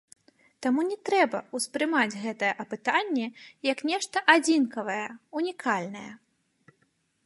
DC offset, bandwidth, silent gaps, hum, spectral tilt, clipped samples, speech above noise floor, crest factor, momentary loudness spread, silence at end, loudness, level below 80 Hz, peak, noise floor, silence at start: under 0.1%; 11.5 kHz; none; none; -3 dB/octave; under 0.1%; 44 dB; 24 dB; 12 LU; 1.1 s; -27 LUFS; -80 dBFS; -4 dBFS; -71 dBFS; 0.6 s